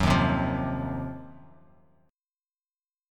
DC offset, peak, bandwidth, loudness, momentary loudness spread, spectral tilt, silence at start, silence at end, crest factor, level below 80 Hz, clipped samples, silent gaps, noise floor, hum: under 0.1%; -10 dBFS; 15 kHz; -28 LUFS; 20 LU; -6.5 dB/octave; 0 s; 1.7 s; 20 dB; -42 dBFS; under 0.1%; none; under -90 dBFS; none